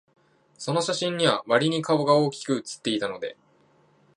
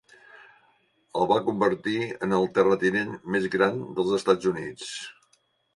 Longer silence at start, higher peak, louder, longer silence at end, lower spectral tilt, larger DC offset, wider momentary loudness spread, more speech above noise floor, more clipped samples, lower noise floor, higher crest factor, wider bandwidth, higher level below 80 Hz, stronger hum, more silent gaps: first, 0.6 s vs 0.35 s; about the same, -4 dBFS vs -6 dBFS; about the same, -24 LUFS vs -25 LUFS; first, 0.85 s vs 0.65 s; about the same, -4.5 dB/octave vs -5.5 dB/octave; neither; about the same, 11 LU vs 12 LU; second, 37 dB vs 43 dB; neither; second, -61 dBFS vs -68 dBFS; about the same, 22 dB vs 20 dB; about the same, 11.5 kHz vs 11.5 kHz; second, -74 dBFS vs -64 dBFS; neither; neither